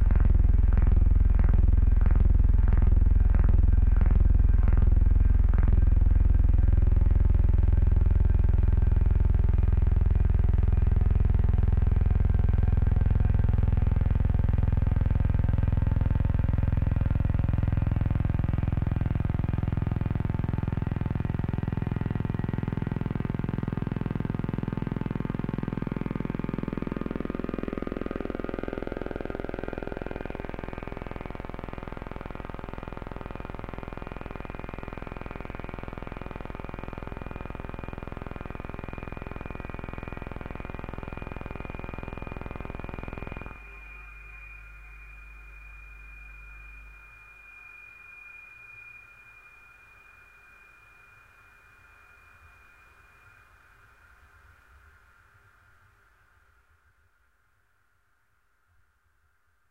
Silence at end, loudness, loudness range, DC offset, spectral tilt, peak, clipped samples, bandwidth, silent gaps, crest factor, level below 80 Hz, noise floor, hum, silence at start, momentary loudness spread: 10.75 s; -28 LUFS; 22 LU; under 0.1%; -10 dB/octave; -12 dBFS; under 0.1%; 4 kHz; none; 14 dB; -28 dBFS; -71 dBFS; none; 0 s; 20 LU